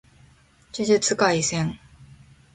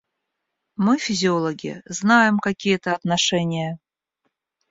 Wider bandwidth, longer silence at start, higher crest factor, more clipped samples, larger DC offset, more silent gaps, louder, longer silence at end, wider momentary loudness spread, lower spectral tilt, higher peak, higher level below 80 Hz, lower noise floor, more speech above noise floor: first, 11 kHz vs 7.8 kHz; about the same, 0.75 s vs 0.8 s; about the same, 20 dB vs 20 dB; neither; neither; neither; about the same, -22 LUFS vs -20 LUFS; second, 0.5 s vs 0.95 s; about the same, 16 LU vs 14 LU; about the same, -3.5 dB/octave vs -4.5 dB/octave; second, -6 dBFS vs -2 dBFS; first, -56 dBFS vs -62 dBFS; second, -55 dBFS vs -79 dBFS; second, 34 dB vs 59 dB